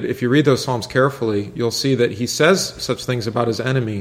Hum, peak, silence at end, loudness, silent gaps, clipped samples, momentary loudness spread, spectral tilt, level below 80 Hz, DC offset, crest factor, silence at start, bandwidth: none; 0 dBFS; 0 s; -19 LUFS; none; under 0.1%; 7 LU; -5 dB/octave; -52 dBFS; under 0.1%; 18 dB; 0 s; 16 kHz